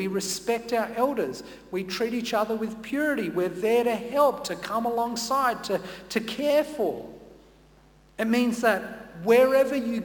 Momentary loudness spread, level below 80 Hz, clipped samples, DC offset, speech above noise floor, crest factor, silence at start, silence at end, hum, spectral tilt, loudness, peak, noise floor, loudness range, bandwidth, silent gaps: 10 LU; -60 dBFS; under 0.1%; under 0.1%; 30 dB; 16 dB; 0 s; 0 s; none; -4 dB/octave; -26 LUFS; -10 dBFS; -56 dBFS; 3 LU; 19 kHz; none